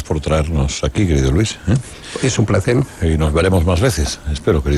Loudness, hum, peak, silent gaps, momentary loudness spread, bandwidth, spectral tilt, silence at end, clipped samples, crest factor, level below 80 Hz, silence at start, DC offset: -17 LUFS; none; -2 dBFS; none; 6 LU; 13 kHz; -6 dB/octave; 0 s; under 0.1%; 14 dB; -26 dBFS; 0 s; under 0.1%